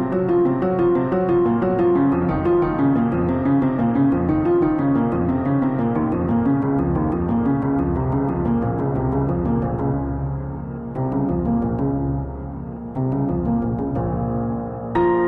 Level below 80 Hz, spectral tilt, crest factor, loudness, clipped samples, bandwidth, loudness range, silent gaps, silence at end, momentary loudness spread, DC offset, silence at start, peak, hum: -36 dBFS; -11.5 dB/octave; 14 dB; -20 LUFS; under 0.1%; 4 kHz; 5 LU; none; 0 s; 7 LU; under 0.1%; 0 s; -6 dBFS; none